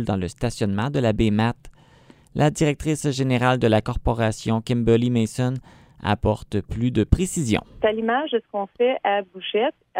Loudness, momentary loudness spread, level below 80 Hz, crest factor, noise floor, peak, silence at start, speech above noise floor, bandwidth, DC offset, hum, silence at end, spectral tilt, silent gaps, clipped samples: -22 LUFS; 7 LU; -38 dBFS; 22 dB; -52 dBFS; 0 dBFS; 0 s; 30 dB; 15.5 kHz; under 0.1%; none; 0 s; -6 dB/octave; none; under 0.1%